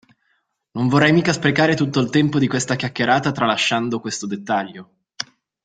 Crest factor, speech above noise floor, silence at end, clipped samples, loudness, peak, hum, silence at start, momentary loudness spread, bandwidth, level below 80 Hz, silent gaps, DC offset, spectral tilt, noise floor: 20 dB; 50 dB; 0.4 s; under 0.1%; -19 LUFS; 0 dBFS; none; 0.75 s; 16 LU; 9.4 kHz; -56 dBFS; none; under 0.1%; -5 dB/octave; -68 dBFS